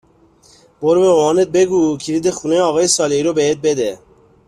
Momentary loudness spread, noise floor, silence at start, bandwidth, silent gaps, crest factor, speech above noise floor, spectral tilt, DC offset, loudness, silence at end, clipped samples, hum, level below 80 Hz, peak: 6 LU; -50 dBFS; 0.8 s; 13 kHz; none; 14 dB; 36 dB; -4 dB/octave; under 0.1%; -15 LUFS; 0.5 s; under 0.1%; none; -54 dBFS; -2 dBFS